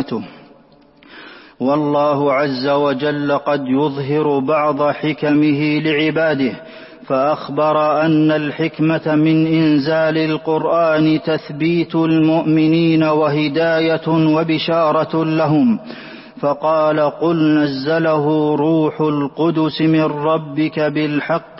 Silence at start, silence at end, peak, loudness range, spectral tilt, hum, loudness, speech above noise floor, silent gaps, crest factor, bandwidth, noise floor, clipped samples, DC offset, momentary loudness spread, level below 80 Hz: 0 s; 0 s; -6 dBFS; 2 LU; -11 dB/octave; none; -16 LUFS; 33 dB; none; 10 dB; 5.8 kHz; -48 dBFS; under 0.1%; under 0.1%; 5 LU; -58 dBFS